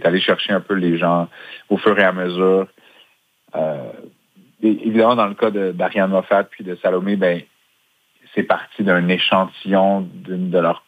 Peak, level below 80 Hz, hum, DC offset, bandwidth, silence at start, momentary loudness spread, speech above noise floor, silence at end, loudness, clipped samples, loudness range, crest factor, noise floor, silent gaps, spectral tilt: 0 dBFS; -70 dBFS; none; under 0.1%; 8.8 kHz; 0 s; 11 LU; 44 dB; 0.1 s; -18 LUFS; under 0.1%; 2 LU; 18 dB; -62 dBFS; none; -7.5 dB/octave